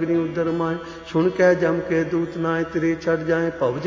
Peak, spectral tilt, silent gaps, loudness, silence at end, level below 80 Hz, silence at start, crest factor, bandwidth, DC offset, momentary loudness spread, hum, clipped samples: -4 dBFS; -7.5 dB/octave; none; -22 LUFS; 0 s; -50 dBFS; 0 s; 16 dB; 7.6 kHz; under 0.1%; 7 LU; none; under 0.1%